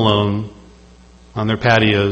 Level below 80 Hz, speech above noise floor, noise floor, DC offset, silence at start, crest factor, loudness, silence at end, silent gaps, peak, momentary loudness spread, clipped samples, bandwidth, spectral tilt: -42 dBFS; 29 dB; -44 dBFS; under 0.1%; 0 s; 18 dB; -16 LUFS; 0 s; none; 0 dBFS; 16 LU; under 0.1%; 8.2 kHz; -6.5 dB/octave